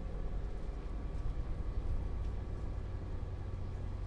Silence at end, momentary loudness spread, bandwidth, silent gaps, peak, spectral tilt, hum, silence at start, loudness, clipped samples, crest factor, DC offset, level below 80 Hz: 0 s; 3 LU; 7.2 kHz; none; -26 dBFS; -8.5 dB/octave; none; 0 s; -43 LUFS; under 0.1%; 12 dB; under 0.1%; -40 dBFS